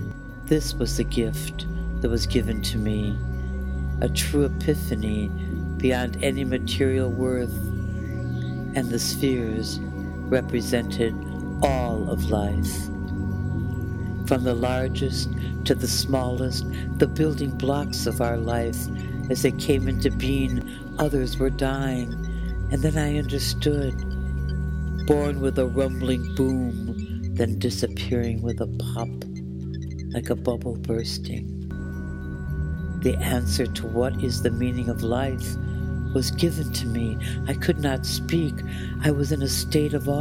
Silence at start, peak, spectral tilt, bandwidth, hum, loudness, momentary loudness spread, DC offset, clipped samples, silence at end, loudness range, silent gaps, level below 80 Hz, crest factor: 0 s; -4 dBFS; -6 dB/octave; 16.5 kHz; none; -26 LUFS; 7 LU; under 0.1%; under 0.1%; 0 s; 3 LU; none; -32 dBFS; 22 dB